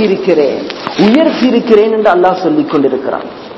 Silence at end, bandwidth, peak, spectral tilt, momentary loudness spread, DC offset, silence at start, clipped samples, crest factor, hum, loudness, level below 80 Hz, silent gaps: 0 s; 8 kHz; 0 dBFS; -7 dB/octave; 10 LU; under 0.1%; 0 s; 0.9%; 10 dB; none; -10 LUFS; -50 dBFS; none